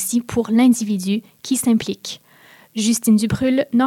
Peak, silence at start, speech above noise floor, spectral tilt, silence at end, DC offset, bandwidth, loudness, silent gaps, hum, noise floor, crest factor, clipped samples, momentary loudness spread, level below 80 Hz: -6 dBFS; 0 s; 31 dB; -4.5 dB/octave; 0 s; under 0.1%; 16.5 kHz; -18 LUFS; none; none; -49 dBFS; 12 dB; under 0.1%; 13 LU; -54 dBFS